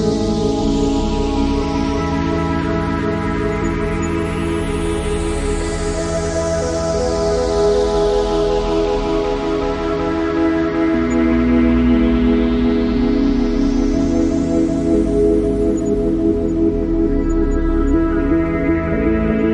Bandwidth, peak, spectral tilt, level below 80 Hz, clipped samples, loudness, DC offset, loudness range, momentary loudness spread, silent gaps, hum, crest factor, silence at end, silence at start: 11.5 kHz; -2 dBFS; -6.5 dB/octave; -24 dBFS; under 0.1%; -17 LUFS; under 0.1%; 4 LU; 5 LU; none; none; 14 dB; 0 s; 0 s